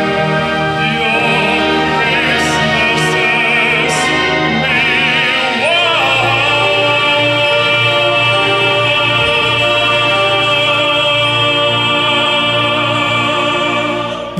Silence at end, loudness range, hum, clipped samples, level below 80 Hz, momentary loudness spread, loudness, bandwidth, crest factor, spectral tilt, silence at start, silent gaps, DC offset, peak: 0 s; 1 LU; none; under 0.1%; -42 dBFS; 3 LU; -11 LUFS; 14 kHz; 10 dB; -3.5 dB/octave; 0 s; none; under 0.1%; -4 dBFS